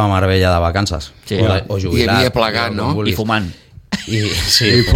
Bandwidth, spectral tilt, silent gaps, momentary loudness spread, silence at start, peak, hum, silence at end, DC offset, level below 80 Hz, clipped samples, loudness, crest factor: 16.5 kHz; -5 dB/octave; none; 10 LU; 0 s; 0 dBFS; none; 0 s; under 0.1%; -32 dBFS; under 0.1%; -15 LUFS; 14 dB